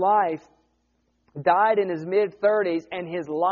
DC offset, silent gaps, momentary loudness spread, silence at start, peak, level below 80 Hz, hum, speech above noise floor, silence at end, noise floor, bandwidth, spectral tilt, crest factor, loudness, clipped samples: under 0.1%; none; 11 LU; 0 s; -6 dBFS; -70 dBFS; none; 47 dB; 0 s; -70 dBFS; 7 kHz; -4 dB/octave; 18 dB; -23 LUFS; under 0.1%